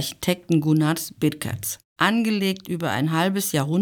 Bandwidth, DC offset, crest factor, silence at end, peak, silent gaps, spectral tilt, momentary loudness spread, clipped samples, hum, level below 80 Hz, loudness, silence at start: over 20 kHz; under 0.1%; 18 dB; 0 s; -4 dBFS; 1.84-1.96 s; -5 dB/octave; 7 LU; under 0.1%; none; -60 dBFS; -23 LUFS; 0 s